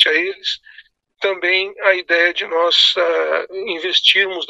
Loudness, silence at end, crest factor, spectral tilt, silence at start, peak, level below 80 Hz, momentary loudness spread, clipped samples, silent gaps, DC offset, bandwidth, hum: -15 LUFS; 0.05 s; 18 dB; -0.5 dB/octave; 0 s; 0 dBFS; -66 dBFS; 11 LU; under 0.1%; none; under 0.1%; 11.5 kHz; none